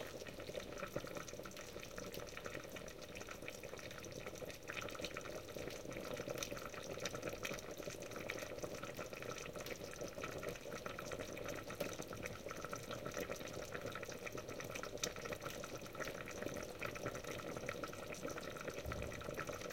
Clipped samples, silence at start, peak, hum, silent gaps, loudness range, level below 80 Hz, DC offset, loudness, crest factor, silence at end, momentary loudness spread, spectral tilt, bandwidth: under 0.1%; 0 s; -22 dBFS; none; none; 3 LU; -64 dBFS; under 0.1%; -47 LUFS; 26 dB; 0 s; 5 LU; -3.5 dB/octave; 17 kHz